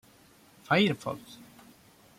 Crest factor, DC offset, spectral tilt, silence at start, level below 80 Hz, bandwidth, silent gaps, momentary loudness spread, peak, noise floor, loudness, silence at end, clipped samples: 22 dB; under 0.1%; -5.5 dB/octave; 0.7 s; -70 dBFS; 16 kHz; none; 25 LU; -12 dBFS; -59 dBFS; -28 LUFS; 0.85 s; under 0.1%